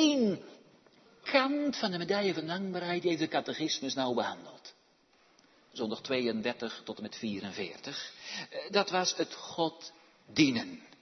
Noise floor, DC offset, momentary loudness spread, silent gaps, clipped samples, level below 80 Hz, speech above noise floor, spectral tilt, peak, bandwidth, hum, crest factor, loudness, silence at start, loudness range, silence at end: -67 dBFS; under 0.1%; 14 LU; none; under 0.1%; -78 dBFS; 34 dB; -4 dB/octave; -10 dBFS; 6.4 kHz; none; 24 dB; -33 LUFS; 0 s; 5 LU; 0.15 s